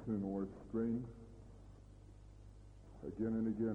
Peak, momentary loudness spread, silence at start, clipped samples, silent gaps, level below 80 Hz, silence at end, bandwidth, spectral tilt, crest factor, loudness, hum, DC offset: -28 dBFS; 22 LU; 0 s; under 0.1%; none; -60 dBFS; 0 s; 7 kHz; -10 dB/octave; 16 dB; -41 LUFS; 50 Hz at -60 dBFS; under 0.1%